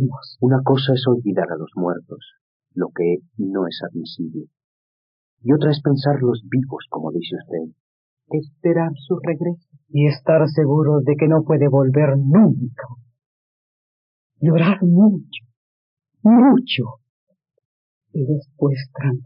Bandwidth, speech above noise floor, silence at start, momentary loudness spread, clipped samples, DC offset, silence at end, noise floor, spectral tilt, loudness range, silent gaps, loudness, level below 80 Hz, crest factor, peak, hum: 5.4 kHz; over 73 dB; 0 s; 15 LU; under 0.1%; under 0.1%; 0 s; under -90 dBFS; -7.5 dB/octave; 8 LU; 2.41-2.60 s, 4.64-5.37 s, 7.80-8.17 s, 13.26-14.30 s, 15.56-15.97 s, 17.09-17.27 s, 17.65-18.01 s; -18 LUFS; -68 dBFS; 14 dB; -4 dBFS; none